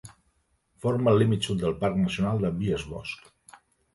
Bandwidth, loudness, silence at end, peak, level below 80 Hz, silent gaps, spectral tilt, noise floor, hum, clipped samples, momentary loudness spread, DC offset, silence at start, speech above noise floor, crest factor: 11.5 kHz; -26 LUFS; 0.8 s; -10 dBFS; -50 dBFS; none; -7 dB/octave; -70 dBFS; none; under 0.1%; 14 LU; under 0.1%; 0.05 s; 45 dB; 18 dB